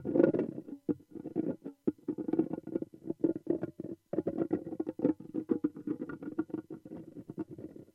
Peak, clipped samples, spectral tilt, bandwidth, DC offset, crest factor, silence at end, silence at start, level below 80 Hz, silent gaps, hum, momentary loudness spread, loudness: -10 dBFS; under 0.1%; -10.5 dB/octave; 3.7 kHz; under 0.1%; 26 dB; 0.1 s; 0 s; -76 dBFS; none; none; 11 LU; -36 LUFS